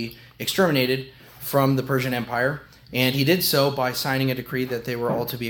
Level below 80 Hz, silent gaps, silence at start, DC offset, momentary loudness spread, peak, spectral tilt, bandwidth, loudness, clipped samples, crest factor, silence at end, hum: -56 dBFS; none; 0 s; under 0.1%; 10 LU; -4 dBFS; -5 dB/octave; 18 kHz; -23 LUFS; under 0.1%; 20 dB; 0 s; none